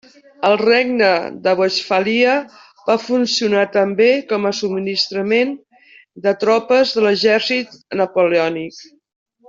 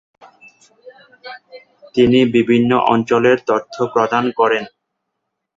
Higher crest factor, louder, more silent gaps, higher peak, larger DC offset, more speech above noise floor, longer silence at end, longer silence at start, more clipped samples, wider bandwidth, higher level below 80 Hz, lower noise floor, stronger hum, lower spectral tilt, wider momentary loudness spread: about the same, 14 dB vs 16 dB; about the same, -16 LUFS vs -15 LUFS; neither; about the same, -2 dBFS vs -2 dBFS; neither; second, 32 dB vs 61 dB; second, 0.65 s vs 0.9 s; second, 0.4 s vs 0.85 s; neither; about the same, 7.6 kHz vs 7.6 kHz; second, -64 dBFS vs -54 dBFS; second, -48 dBFS vs -76 dBFS; neither; second, -4 dB/octave vs -6.5 dB/octave; second, 8 LU vs 22 LU